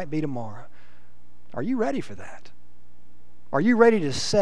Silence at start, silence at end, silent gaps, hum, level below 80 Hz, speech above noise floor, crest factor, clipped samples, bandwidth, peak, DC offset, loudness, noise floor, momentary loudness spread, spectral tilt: 0 s; 0 s; none; 60 Hz at -55 dBFS; -58 dBFS; 35 dB; 22 dB; under 0.1%; 11 kHz; -4 dBFS; 3%; -23 LUFS; -58 dBFS; 23 LU; -5.5 dB/octave